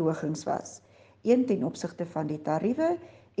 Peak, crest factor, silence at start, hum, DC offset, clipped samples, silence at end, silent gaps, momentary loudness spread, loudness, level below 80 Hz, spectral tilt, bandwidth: -12 dBFS; 18 dB; 0 s; none; under 0.1%; under 0.1%; 0.3 s; none; 11 LU; -29 LUFS; -72 dBFS; -6.5 dB/octave; 9.6 kHz